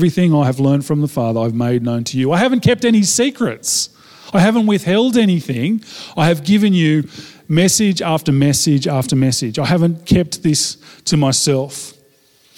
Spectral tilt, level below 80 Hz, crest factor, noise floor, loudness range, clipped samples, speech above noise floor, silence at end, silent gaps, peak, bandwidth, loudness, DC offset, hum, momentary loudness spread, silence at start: -5 dB/octave; -46 dBFS; 14 dB; -53 dBFS; 1 LU; under 0.1%; 38 dB; 0.65 s; none; -2 dBFS; 17 kHz; -15 LUFS; under 0.1%; none; 7 LU; 0 s